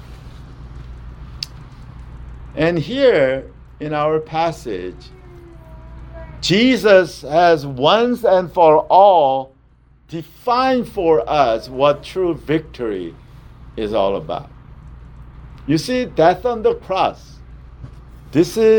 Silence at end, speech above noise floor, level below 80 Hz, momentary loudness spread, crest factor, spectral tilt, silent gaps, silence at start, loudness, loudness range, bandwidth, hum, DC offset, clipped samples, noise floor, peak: 0 s; 35 dB; -40 dBFS; 24 LU; 18 dB; -5.5 dB/octave; none; 0 s; -16 LUFS; 10 LU; 19.5 kHz; none; under 0.1%; under 0.1%; -51 dBFS; 0 dBFS